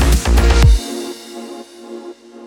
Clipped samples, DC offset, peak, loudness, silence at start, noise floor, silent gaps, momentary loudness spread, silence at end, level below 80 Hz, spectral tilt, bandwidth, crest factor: under 0.1%; under 0.1%; 0 dBFS; -14 LUFS; 0 s; -34 dBFS; none; 21 LU; 0 s; -16 dBFS; -5 dB/octave; 16.5 kHz; 14 dB